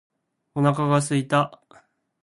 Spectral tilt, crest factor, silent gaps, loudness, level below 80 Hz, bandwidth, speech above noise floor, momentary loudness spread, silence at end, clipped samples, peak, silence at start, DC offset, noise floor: -6 dB/octave; 18 dB; none; -22 LUFS; -60 dBFS; 11.5 kHz; 36 dB; 8 LU; 0.65 s; under 0.1%; -6 dBFS; 0.55 s; under 0.1%; -57 dBFS